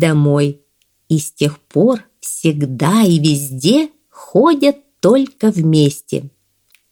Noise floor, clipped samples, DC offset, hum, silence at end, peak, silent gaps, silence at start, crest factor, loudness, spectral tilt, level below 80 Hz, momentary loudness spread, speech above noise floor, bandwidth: -57 dBFS; under 0.1%; under 0.1%; none; 0.65 s; 0 dBFS; none; 0 s; 14 dB; -15 LUFS; -6 dB/octave; -58 dBFS; 9 LU; 43 dB; 18 kHz